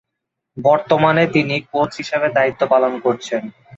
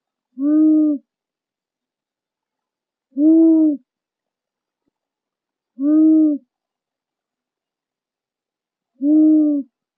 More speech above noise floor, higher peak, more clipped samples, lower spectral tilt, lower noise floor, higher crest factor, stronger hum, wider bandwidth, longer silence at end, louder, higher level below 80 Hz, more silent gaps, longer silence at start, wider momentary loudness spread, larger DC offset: second, 62 dB vs 75 dB; first, -2 dBFS vs -6 dBFS; neither; second, -6 dB/octave vs -12 dB/octave; second, -79 dBFS vs -88 dBFS; about the same, 16 dB vs 14 dB; neither; first, 7.8 kHz vs 1.6 kHz; about the same, 0.3 s vs 0.35 s; about the same, -17 LUFS vs -15 LUFS; first, -58 dBFS vs under -90 dBFS; neither; first, 0.55 s vs 0.4 s; second, 7 LU vs 13 LU; neither